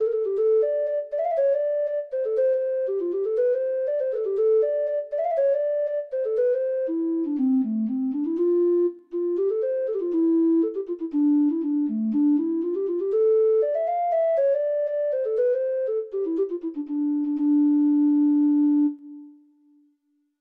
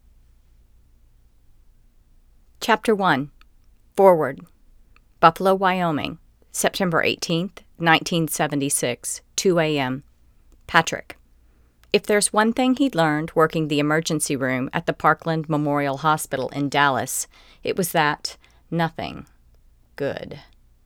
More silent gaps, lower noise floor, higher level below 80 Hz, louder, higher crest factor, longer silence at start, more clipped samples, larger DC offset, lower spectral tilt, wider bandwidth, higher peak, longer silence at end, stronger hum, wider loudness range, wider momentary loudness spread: neither; first, -70 dBFS vs -56 dBFS; second, -74 dBFS vs -54 dBFS; about the same, -23 LUFS vs -21 LUFS; second, 8 dB vs 22 dB; second, 0 s vs 2.6 s; neither; neither; first, -10 dB/octave vs -4 dB/octave; second, 3.1 kHz vs 19.5 kHz; second, -14 dBFS vs 0 dBFS; first, 1.1 s vs 0.45 s; neither; second, 2 LU vs 6 LU; second, 7 LU vs 13 LU